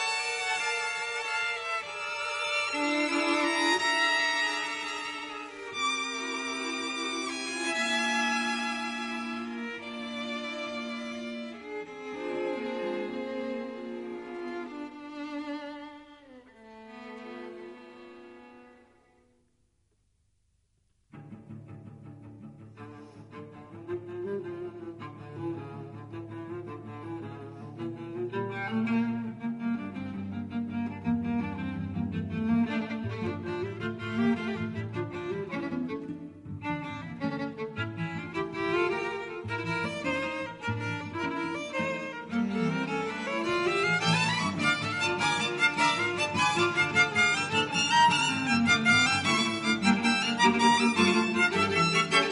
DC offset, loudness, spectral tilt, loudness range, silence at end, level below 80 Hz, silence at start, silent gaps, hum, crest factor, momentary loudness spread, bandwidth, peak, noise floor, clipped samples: under 0.1%; -29 LUFS; -4 dB/octave; 18 LU; 0 s; -64 dBFS; 0 s; none; none; 20 dB; 19 LU; 10.5 kHz; -10 dBFS; -71 dBFS; under 0.1%